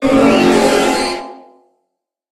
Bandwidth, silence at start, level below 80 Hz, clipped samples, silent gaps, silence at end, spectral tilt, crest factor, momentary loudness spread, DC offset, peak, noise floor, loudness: 15.5 kHz; 0 s; -42 dBFS; under 0.1%; none; 1 s; -4 dB/octave; 14 dB; 14 LU; under 0.1%; 0 dBFS; -74 dBFS; -12 LUFS